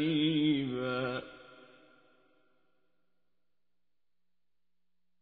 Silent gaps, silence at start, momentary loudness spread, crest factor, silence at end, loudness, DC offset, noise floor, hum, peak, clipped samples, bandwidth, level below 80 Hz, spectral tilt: none; 0 s; 20 LU; 18 dB; 3.6 s; -32 LUFS; under 0.1%; under -90 dBFS; 60 Hz at -85 dBFS; -20 dBFS; under 0.1%; 4.8 kHz; -72 dBFS; -4.5 dB/octave